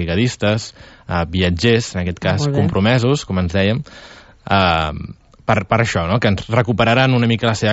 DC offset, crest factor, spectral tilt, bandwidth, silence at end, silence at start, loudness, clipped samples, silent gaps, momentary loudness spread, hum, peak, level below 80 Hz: under 0.1%; 14 dB; -6 dB/octave; 8.2 kHz; 0 s; 0 s; -17 LUFS; under 0.1%; none; 10 LU; none; -2 dBFS; -38 dBFS